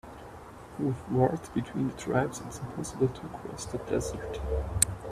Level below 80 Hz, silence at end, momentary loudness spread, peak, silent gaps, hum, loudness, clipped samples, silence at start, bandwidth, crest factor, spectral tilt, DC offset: -44 dBFS; 0 s; 15 LU; -4 dBFS; none; none; -32 LUFS; under 0.1%; 0.05 s; 14.5 kHz; 28 dB; -5 dB/octave; under 0.1%